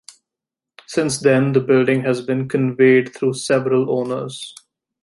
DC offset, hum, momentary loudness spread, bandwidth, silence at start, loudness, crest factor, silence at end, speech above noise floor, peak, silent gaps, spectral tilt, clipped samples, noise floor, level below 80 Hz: under 0.1%; none; 11 LU; 11.5 kHz; 0.9 s; -18 LUFS; 16 dB; 0.55 s; 69 dB; -2 dBFS; none; -6 dB/octave; under 0.1%; -86 dBFS; -62 dBFS